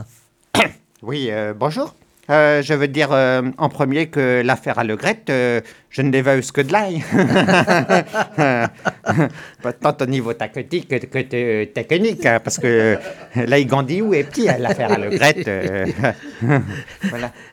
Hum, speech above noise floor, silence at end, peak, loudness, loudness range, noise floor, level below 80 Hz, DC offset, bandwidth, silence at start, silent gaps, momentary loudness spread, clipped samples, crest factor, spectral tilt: none; 34 dB; 0.1 s; 0 dBFS; -18 LUFS; 3 LU; -52 dBFS; -56 dBFS; under 0.1%; 18 kHz; 0 s; none; 10 LU; under 0.1%; 18 dB; -5.5 dB/octave